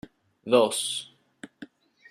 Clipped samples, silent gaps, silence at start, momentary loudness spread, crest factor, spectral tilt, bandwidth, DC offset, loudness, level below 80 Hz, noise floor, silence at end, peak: under 0.1%; none; 0.45 s; 23 LU; 22 dB; -2.5 dB/octave; 14 kHz; under 0.1%; -25 LUFS; -72 dBFS; -50 dBFS; 0.45 s; -6 dBFS